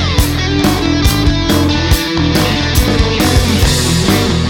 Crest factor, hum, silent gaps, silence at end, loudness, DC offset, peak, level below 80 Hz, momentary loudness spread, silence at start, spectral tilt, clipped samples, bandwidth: 12 dB; none; none; 0 s; -12 LUFS; under 0.1%; 0 dBFS; -18 dBFS; 2 LU; 0 s; -4.5 dB/octave; under 0.1%; 20 kHz